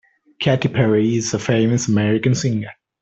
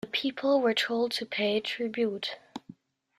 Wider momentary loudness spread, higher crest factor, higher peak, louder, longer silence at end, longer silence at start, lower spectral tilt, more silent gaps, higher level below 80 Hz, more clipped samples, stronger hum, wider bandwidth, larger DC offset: second, 6 LU vs 15 LU; about the same, 16 dB vs 16 dB; first, -2 dBFS vs -14 dBFS; first, -18 LUFS vs -29 LUFS; second, 0.3 s vs 0.6 s; first, 0.4 s vs 0.05 s; first, -5.5 dB/octave vs -4 dB/octave; neither; first, -54 dBFS vs -76 dBFS; neither; neither; second, 8.2 kHz vs 14.5 kHz; neither